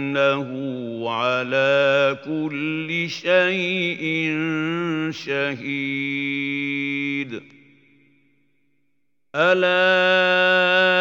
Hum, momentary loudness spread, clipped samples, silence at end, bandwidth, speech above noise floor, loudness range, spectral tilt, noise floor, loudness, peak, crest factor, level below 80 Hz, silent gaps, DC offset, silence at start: none; 10 LU; under 0.1%; 0 s; 7.4 kHz; 55 dB; 6 LU; -5.5 dB/octave; -76 dBFS; -20 LUFS; -4 dBFS; 18 dB; -76 dBFS; none; under 0.1%; 0 s